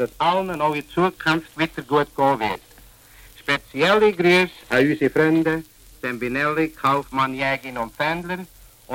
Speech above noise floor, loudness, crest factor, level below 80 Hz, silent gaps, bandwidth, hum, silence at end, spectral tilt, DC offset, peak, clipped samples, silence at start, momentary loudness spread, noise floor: 27 dB; -21 LUFS; 16 dB; -52 dBFS; none; 17 kHz; none; 0 s; -5.5 dB/octave; under 0.1%; -4 dBFS; under 0.1%; 0 s; 11 LU; -48 dBFS